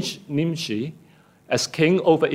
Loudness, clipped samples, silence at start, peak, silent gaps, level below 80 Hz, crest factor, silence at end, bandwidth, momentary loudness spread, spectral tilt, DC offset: -22 LUFS; under 0.1%; 0 s; -6 dBFS; none; -64 dBFS; 16 dB; 0 s; 16 kHz; 10 LU; -5 dB/octave; under 0.1%